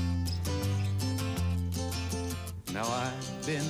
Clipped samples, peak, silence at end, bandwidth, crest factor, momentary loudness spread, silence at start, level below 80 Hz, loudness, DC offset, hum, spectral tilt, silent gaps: under 0.1%; -20 dBFS; 0 s; over 20 kHz; 12 dB; 5 LU; 0 s; -46 dBFS; -33 LUFS; under 0.1%; none; -5 dB/octave; none